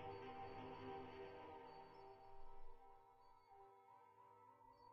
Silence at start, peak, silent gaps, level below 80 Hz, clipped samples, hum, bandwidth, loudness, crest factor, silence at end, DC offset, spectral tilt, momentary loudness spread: 0 s; -42 dBFS; none; -68 dBFS; under 0.1%; none; 6.4 kHz; -60 LUFS; 16 dB; 0 s; under 0.1%; -4.5 dB/octave; 14 LU